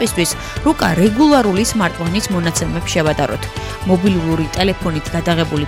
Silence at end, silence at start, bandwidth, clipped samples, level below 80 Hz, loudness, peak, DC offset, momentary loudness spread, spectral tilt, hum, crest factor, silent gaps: 0 s; 0 s; 16.5 kHz; under 0.1%; -32 dBFS; -16 LUFS; -2 dBFS; under 0.1%; 8 LU; -5 dB/octave; none; 12 dB; none